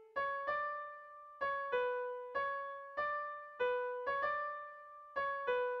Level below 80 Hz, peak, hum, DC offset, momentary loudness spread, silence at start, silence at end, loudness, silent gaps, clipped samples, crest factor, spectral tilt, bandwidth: -76 dBFS; -24 dBFS; none; under 0.1%; 10 LU; 0 s; 0 s; -39 LUFS; none; under 0.1%; 14 dB; -4 dB/octave; 6 kHz